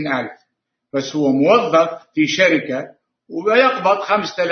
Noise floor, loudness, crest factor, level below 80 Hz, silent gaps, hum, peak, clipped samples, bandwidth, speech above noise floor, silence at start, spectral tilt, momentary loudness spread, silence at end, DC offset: -72 dBFS; -17 LUFS; 16 dB; -66 dBFS; none; none; -2 dBFS; under 0.1%; 6.6 kHz; 55 dB; 0 s; -4.5 dB/octave; 13 LU; 0 s; under 0.1%